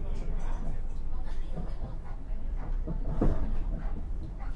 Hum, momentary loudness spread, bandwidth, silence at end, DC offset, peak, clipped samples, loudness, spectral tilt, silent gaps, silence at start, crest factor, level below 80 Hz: none; 10 LU; 3.6 kHz; 0 s; under 0.1%; -12 dBFS; under 0.1%; -38 LUFS; -8.5 dB/octave; none; 0 s; 16 dB; -30 dBFS